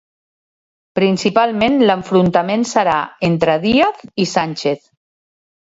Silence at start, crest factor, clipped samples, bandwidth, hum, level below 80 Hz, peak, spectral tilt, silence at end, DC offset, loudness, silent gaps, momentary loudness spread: 0.95 s; 16 dB; under 0.1%; 8 kHz; none; -52 dBFS; 0 dBFS; -5.5 dB/octave; 1 s; under 0.1%; -16 LUFS; none; 7 LU